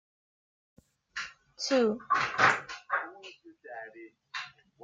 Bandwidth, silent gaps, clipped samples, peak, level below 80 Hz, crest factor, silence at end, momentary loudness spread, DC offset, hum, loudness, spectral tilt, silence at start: 9.4 kHz; none; under 0.1%; -10 dBFS; -72 dBFS; 24 dB; 0.35 s; 21 LU; under 0.1%; none; -30 LUFS; -3 dB/octave; 1.15 s